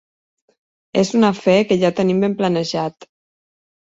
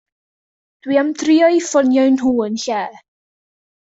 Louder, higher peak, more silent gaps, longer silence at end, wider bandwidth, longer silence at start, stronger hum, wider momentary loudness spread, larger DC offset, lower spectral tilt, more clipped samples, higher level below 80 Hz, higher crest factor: about the same, -17 LUFS vs -15 LUFS; about the same, -2 dBFS vs -2 dBFS; neither; second, 0.75 s vs 0.9 s; about the same, 8 kHz vs 8 kHz; about the same, 0.95 s vs 0.85 s; neither; about the same, 8 LU vs 10 LU; neither; first, -6 dB/octave vs -4 dB/octave; neither; about the same, -58 dBFS vs -60 dBFS; about the same, 16 dB vs 16 dB